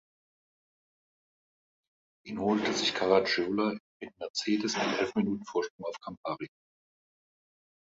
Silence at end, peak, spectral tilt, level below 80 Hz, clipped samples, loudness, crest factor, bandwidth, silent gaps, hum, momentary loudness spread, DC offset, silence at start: 1.45 s; -10 dBFS; -4 dB/octave; -70 dBFS; under 0.1%; -30 LUFS; 22 dB; 8 kHz; 3.80-4.00 s, 4.30-4.34 s, 5.70-5.79 s, 6.17-6.23 s; none; 15 LU; under 0.1%; 2.25 s